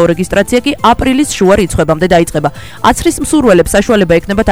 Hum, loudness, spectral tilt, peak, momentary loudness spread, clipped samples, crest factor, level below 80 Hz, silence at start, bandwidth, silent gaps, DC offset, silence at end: none; -10 LUFS; -5 dB/octave; 0 dBFS; 4 LU; 0.4%; 10 dB; -26 dBFS; 0 s; over 20 kHz; none; 2%; 0 s